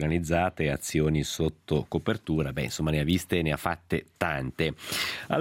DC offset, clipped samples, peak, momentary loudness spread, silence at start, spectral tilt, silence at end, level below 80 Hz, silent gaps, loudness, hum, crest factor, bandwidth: under 0.1%; under 0.1%; -8 dBFS; 5 LU; 0 s; -5.5 dB/octave; 0 s; -46 dBFS; none; -28 LUFS; none; 20 dB; 16.5 kHz